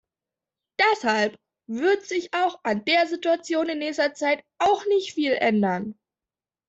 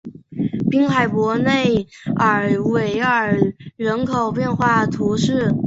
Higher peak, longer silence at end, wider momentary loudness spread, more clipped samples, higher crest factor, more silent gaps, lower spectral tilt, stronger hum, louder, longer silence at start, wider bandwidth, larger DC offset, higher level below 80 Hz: second, -6 dBFS vs -2 dBFS; first, 0.75 s vs 0 s; about the same, 6 LU vs 6 LU; neither; about the same, 18 dB vs 16 dB; neither; second, -4.5 dB/octave vs -6.5 dB/octave; neither; second, -23 LUFS vs -18 LUFS; first, 0.8 s vs 0.05 s; about the same, 8 kHz vs 8 kHz; neither; second, -68 dBFS vs -48 dBFS